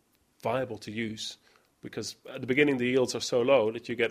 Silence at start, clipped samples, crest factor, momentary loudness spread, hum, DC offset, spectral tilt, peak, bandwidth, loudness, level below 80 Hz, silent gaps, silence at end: 0.45 s; under 0.1%; 20 dB; 14 LU; none; under 0.1%; -4.5 dB/octave; -10 dBFS; 15.5 kHz; -29 LUFS; -68 dBFS; none; 0 s